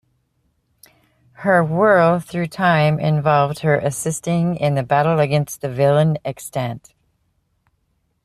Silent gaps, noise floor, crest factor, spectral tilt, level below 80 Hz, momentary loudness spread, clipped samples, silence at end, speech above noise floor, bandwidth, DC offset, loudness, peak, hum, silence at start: none; -67 dBFS; 18 dB; -6 dB/octave; -54 dBFS; 10 LU; under 0.1%; 1.45 s; 50 dB; 14 kHz; under 0.1%; -18 LUFS; -2 dBFS; none; 1.4 s